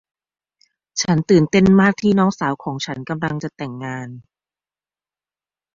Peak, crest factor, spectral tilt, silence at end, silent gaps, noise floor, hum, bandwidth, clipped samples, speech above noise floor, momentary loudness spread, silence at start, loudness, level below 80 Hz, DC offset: -2 dBFS; 18 dB; -6 dB/octave; 1.55 s; none; under -90 dBFS; 50 Hz at -40 dBFS; 7.4 kHz; under 0.1%; over 73 dB; 16 LU; 0.95 s; -18 LUFS; -50 dBFS; under 0.1%